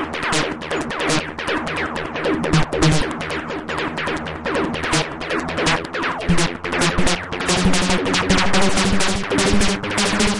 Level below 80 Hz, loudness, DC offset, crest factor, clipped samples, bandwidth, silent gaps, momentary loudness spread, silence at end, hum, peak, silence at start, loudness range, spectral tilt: -34 dBFS; -20 LUFS; under 0.1%; 14 dB; under 0.1%; 11.5 kHz; none; 7 LU; 0 s; none; -4 dBFS; 0 s; 3 LU; -4 dB/octave